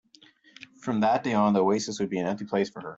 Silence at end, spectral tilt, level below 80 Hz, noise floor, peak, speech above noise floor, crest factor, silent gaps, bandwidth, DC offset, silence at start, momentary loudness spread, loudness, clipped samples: 0 s; -5.5 dB/octave; -68 dBFS; -57 dBFS; -12 dBFS; 32 dB; 16 dB; none; 8 kHz; under 0.1%; 0.6 s; 7 LU; -26 LUFS; under 0.1%